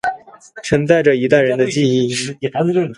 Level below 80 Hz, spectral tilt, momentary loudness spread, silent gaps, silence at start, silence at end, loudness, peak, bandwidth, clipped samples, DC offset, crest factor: -48 dBFS; -5.5 dB/octave; 10 LU; none; 0.05 s; 0.05 s; -15 LUFS; 0 dBFS; 11.5 kHz; under 0.1%; under 0.1%; 16 dB